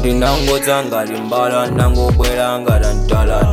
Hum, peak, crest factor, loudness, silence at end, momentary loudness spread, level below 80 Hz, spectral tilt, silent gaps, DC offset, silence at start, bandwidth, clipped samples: none; 0 dBFS; 12 dB; -15 LUFS; 0 s; 3 LU; -18 dBFS; -5.5 dB/octave; none; under 0.1%; 0 s; 16.5 kHz; under 0.1%